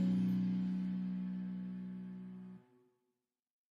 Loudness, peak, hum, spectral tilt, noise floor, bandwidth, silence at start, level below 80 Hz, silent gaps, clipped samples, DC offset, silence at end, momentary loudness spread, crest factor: -39 LUFS; -26 dBFS; none; -9.5 dB/octave; -88 dBFS; 5.2 kHz; 0 s; -72 dBFS; none; under 0.1%; under 0.1%; 1.2 s; 17 LU; 14 dB